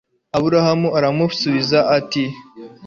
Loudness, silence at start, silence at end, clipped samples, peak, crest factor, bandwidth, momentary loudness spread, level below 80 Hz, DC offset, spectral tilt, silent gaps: -17 LUFS; 0.35 s; 0 s; under 0.1%; -2 dBFS; 16 dB; 7.4 kHz; 8 LU; -56 dBFS; under 0.1%; -6 dB/octave; none